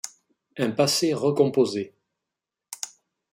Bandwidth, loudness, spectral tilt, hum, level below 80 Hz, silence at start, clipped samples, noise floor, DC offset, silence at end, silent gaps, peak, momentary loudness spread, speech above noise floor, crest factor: 16 kHz; -23 LUFS; -4.5 dB/octave; none; -70 dBFS; 0.05 s; under 0.1%; -87 dBFS; under 0.1%; 0.45 s; none; -6 dBFS; 18 LU; 64 dB; 20 dB